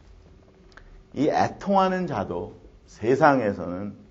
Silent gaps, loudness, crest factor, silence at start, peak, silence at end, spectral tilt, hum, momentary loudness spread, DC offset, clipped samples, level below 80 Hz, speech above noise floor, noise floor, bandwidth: none; -24 LUFS; 22 dB; 0.9 s; -2 dBFS; 0.1 s; -7 dB/octave; none; 15 LU; under 0.1%; under 0.1%; -54 dBFS; 29 dB; -52 dBFS; 7.8 kHz